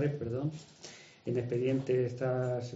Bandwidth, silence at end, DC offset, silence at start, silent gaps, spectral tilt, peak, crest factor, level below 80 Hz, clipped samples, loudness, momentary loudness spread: 8 kHz; 0 s; under 0.1%; 0 s; none; -7.5 dB/octave; -18 dBFS; 14 dB; -68 dBFS; under 0.1%; -34 LUFS; 18 LU